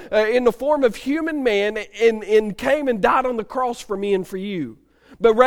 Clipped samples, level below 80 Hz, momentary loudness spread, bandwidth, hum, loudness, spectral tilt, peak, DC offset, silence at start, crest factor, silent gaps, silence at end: under 0.1%; -48 dBFS; 8 LU; 16.5 kHz; none; -20 LUFS; -5 dB/octave; 0 dBFS; under 0.1%; 0 s; 20 dB; none; 0 s